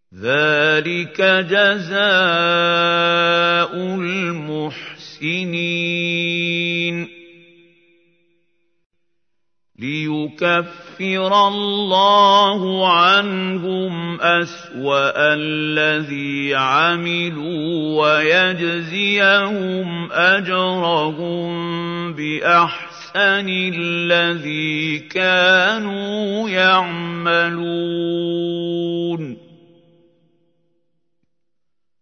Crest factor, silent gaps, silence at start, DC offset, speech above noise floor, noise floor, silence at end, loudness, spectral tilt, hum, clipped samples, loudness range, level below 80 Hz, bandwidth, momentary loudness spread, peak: 18 dB; 8.86-8.90 s; 0.15 s; under 0.1%; 65 dB; -82 dBFS; 2.65 s; -17 LUFS; -5 dB/octave; none; under 0.1%; 10 LU; -70 dBFS; 6.6 kHz; 11 LU; 0 dBFS